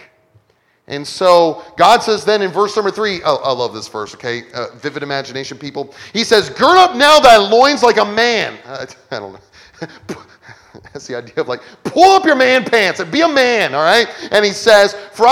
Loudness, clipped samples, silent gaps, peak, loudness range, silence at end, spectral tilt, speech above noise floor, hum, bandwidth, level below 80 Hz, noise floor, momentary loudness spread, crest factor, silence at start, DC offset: -12 LUFS; 0.4%; none; 0 dBFS; 10 LU; 0 s; -3 dB/octave; 45 dB; none; 19 kHz; -52 dBFS; -58 dBFS; 19 LU; 14 dB; 0.9 s; under 0.1%